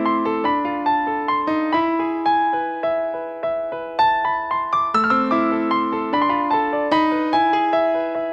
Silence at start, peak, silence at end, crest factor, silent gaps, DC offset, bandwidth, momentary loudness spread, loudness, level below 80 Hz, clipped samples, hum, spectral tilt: 0 s; -6 dBFS; 0 s; 14 dB; none; under 0.1%; 7.2 kHz; 5 LU; -20 LUFS; -58 dBFS; under 0.1%; none; -6 dB/octave